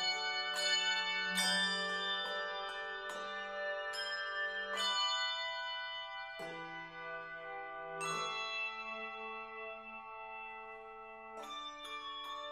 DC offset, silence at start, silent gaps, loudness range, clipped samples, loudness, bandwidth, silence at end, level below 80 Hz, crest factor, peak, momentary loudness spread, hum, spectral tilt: under 0.1%; 0 s; none; 10 LU; under 0.1%; -38 LUFS; 16 kHz; 0 s; -78 dBFS; 18 dB; -22 dBFS; 14 LU; none; -0.5 dB/octave